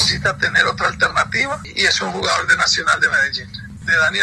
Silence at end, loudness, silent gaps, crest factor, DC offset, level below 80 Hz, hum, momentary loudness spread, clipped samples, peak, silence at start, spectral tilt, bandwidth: 0 s; -16 LUFS; none; 18 dB; under 0.1%; -44 dBFS; none; 6 LU; under 0.1%; 0 dBFS; 0 s; -2 dB/octave; 12.5 kHz